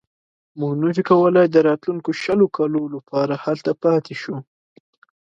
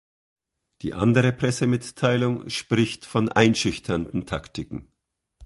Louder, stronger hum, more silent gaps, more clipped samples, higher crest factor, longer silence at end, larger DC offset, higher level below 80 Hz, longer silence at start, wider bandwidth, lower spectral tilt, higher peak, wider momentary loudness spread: first, -19 LUFS vs -23 LUFS; neither; neither; neither; second, 18 dB vs 24 dB; first, 0.85 s vs 0 s; neither; second, -66 dBFS vs -50 dBFS; second, 0.55 s vs 0.85 s; second, 7.6 kHz vs 11.5 kHz; first, -7.5 dB/octave vs -5.5 dB/octave; about the same, -2 dBFS vs -2 dBFS; about the same, 13 LU vs 15 LU